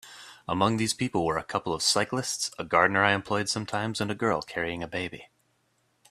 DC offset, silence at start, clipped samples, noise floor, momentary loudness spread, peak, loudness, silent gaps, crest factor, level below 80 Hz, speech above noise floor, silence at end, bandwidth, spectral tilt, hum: under 0.1%; 0.05 s; under 0.1%; -71 dBFS; 10 LU; -4 dBFS; -27 LUFS; none; 24 dB; -60 dBFS; 43 dB; 0.85 s; 14.5 kHz; -3.5 dB/octave; none